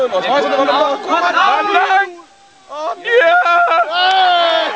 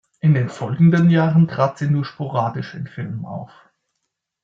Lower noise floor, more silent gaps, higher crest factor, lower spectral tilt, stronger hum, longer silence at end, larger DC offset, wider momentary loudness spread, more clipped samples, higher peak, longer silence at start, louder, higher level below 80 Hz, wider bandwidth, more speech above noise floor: second, -44 dBFS vs -77 dBFS; neither; about the same, 12 dB vs 14 dB; second, -2 dB/octave vs -9 dB/octave; neither; second, 0 s vs 1 s; first, 0.1% vs under 0.1%; second, 11 LU vs 15 LU; neither; about the same, -2 dBFS vs -4 dBFS; second, 0 s vs 0.25 s; first, -13 LUFS vs -18 LUFS; second, -70 dBFS vs -58 dBFS; about the same, 8 kHz vs 7.4 kHz; second, 30 dB vs 59 dB